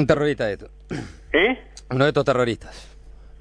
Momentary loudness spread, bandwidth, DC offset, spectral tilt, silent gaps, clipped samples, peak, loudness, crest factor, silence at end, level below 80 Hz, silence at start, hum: 15 LU; 10.5 kHz; under 0.1%; -6 dB/octave; none; under 0.1%; -4 dBFS; -22 LUFS; 18 dB; 0.05 s; -44 dBFS; 0 s; none